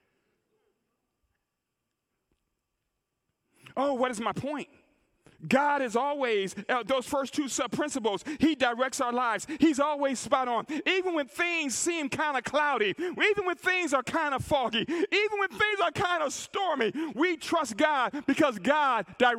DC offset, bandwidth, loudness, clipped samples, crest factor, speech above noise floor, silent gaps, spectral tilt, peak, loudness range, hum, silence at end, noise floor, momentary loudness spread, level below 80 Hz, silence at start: under 0.1%; 16 kHz; -28 LUFS; under 0.1%; 20 dB; 56 dB; none; -3 dB/octave; -10 dBFS; 8 LU; none; 0 s; -84 dBFS; 5 LU; -66 dBFS; 3.75 s